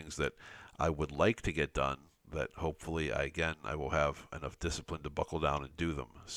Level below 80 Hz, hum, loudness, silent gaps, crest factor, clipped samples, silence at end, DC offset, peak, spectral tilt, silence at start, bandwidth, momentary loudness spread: -50 dBFS; none; -36 LUFS; none; 20 dB; under 0.1%; 0 s; under 0.1%; -16 dBFS; -5 dB/octave; 0 s; 15 kHz; 12 LU